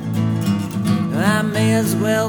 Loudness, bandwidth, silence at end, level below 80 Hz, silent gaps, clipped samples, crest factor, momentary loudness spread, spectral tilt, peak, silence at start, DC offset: -18 LUFS; over 20 kHz; 0 s; -52 dBFS; none; under 0.1%; 14 dB; 4 LU; -6 dB/octave; -4 dBFS; 0 s; under 0.1%